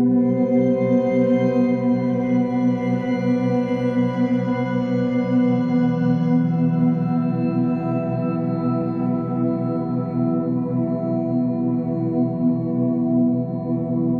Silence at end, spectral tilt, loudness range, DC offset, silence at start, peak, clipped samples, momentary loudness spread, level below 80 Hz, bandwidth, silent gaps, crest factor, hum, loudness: 0 s; -10 dB/octave; 3 LU; under 0.1%; 0 s; -8 dBFS; under 0.1%; 4 LU; -56 dBFS; 6.2 kHz; none; 12 dB; none; -21 LUFS